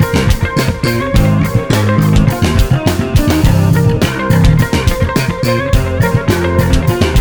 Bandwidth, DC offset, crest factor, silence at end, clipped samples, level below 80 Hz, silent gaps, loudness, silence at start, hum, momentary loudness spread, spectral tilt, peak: over 20 kHz; under 0.1%; 10 dB; 0 s; under 0.1%; -18 dBFS; none; -12 LUFS; 0 s; none; 4 LU; -6 dB/octave; 0 dBFS